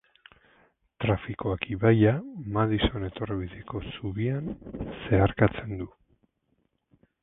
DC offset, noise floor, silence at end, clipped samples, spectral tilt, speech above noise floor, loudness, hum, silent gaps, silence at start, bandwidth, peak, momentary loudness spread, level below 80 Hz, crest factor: under 0.1%; -73 dBFS; 1.35 s; under 0.1%; -11.5 dB/octave; 47 dB; -28 LUFS; none; none; 1 s; 3.9 kHz; -6 dBFS; 15 LU; -44 dBFS; 22 dB